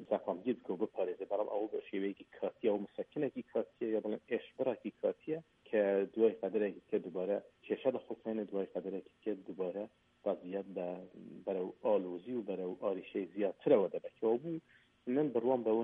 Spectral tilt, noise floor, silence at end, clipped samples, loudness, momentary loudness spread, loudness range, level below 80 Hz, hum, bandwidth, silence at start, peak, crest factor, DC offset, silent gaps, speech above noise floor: -9 dB/octave; -58 dBFS; 0 s; under 0.1%; -38 LUFS; 10 LU; 4 LU; -84 dBFS; none; 3.8 kHz; 0 s; -16 dBFS; 20 dB; under 0.1%; none; 20 dB